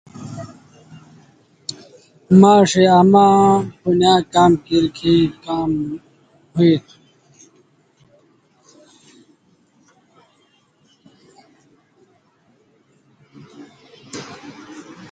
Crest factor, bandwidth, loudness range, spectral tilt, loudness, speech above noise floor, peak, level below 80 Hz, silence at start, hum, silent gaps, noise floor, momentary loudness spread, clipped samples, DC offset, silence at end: 18 dB; 9.4 kHz; 11 LU; -6.5 dB/octave; -14 LUFS; 45 dB; 0 dBFS; -52 dBFS; 0.2 s; none; none; -59 dBFS; 25 LU; under 0.1%; under 0.1%; 0.3 s